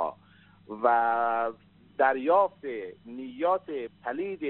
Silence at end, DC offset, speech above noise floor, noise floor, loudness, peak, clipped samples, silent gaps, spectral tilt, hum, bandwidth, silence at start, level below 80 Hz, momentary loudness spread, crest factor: 0 s; under 0.1%; 30 dB; -57 dBFS; -27 LUFS; -8 dBFS; under 0.1%; none; -3 dB/octave; 50 Hz at -65 dBFS; 4.2 kHz; 0 s; -74 dBFS; 17 LU; 20 dB